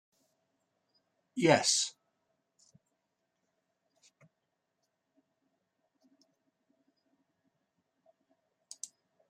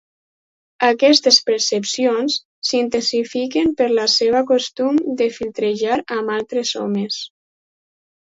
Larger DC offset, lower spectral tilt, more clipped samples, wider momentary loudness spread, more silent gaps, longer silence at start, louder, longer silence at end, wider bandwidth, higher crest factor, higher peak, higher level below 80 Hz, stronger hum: neither; about the same, -3 dB/octave vs -2.5 dB/octave; neither; first, 21 LU vs 9 LU; second, none vs 2.45-2.62 s; first, 1.35 s vs 0.8 s; second, -28 LUFS vs -17 LUFS; first, 7.4 s vs 1.05 s; first, 14.5 kHz vs 8 kHz; first, 32 dB vs 18 dB; second, -8 dBFS vs 0 dBFS; second, -86 dBFS vs -60 dBFS; neither